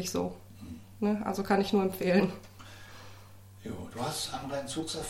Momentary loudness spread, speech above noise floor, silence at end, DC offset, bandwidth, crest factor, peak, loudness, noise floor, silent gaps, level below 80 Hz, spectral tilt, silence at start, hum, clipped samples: 22 LU; 20 dB; 0 s; under 0.1%; 16.5 kHz; 20 dB; -14 dBFS; -31 LUFS; -51 dBFS; none; -58 dBFS; -5 dB/octave; 0 s; none; under 0.1%